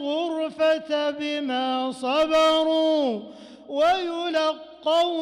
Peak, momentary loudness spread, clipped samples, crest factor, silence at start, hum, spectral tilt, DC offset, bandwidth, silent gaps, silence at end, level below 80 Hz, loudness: -14 dBFS; 8 LU; under 0.1%; 10 dB; 0 s; none; -3.5 dB/octave; under 0.1%; 11.5 kHz; none; 0 s; -62 dBFS; -23 LUFS